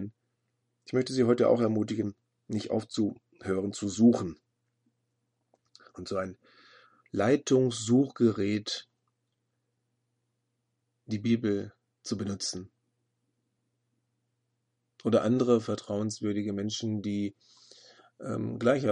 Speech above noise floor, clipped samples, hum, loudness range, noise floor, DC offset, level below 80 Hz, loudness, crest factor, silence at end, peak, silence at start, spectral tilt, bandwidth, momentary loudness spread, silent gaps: 52 dB; under 0.1%; none; 7 LU; -80 dBFS; under 0.1%; -72 dBFS; -29 LUFS; 20 dB; 0 s; -10 dBFS; 0 s; -6 dB/octave; 10.5 kHz; 13 LU; none